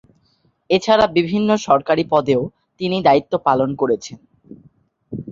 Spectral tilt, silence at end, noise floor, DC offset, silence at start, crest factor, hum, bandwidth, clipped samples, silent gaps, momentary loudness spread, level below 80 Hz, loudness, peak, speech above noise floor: -6 dB/octave; 0 s; -62 dBFS; under 0.1%; 0.7 s; 18 dB; none; 7.6 kHz; under 0.1%; none; 13 LU; -54 dBFS; -17 LUFS; -2 dBFS; 45 dB